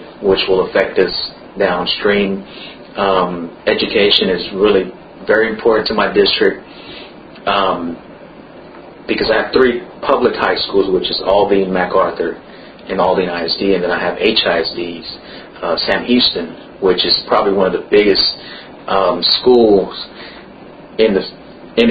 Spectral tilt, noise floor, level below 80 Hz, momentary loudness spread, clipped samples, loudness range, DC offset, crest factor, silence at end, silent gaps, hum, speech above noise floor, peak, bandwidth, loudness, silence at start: -7 dB/octave; -36 dBFS; -44 dBFS; 17 LU; under 0.1%; 3 LU; under 0.1%; 16 dB; 0 s; none; none; 22 dB; 0 dBFS; 5.2 kHz; -14 LUFS; 0 s